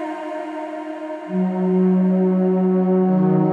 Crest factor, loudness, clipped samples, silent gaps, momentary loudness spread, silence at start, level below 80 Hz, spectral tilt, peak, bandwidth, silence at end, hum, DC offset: 12 dB; -19 LUFS; under 0.1%; none; 12 LU; 0 s; -70 dBFS; -10.5 dB/octave; -6 dBFS; 3.3 kHz; 0 s; none; under 0.1%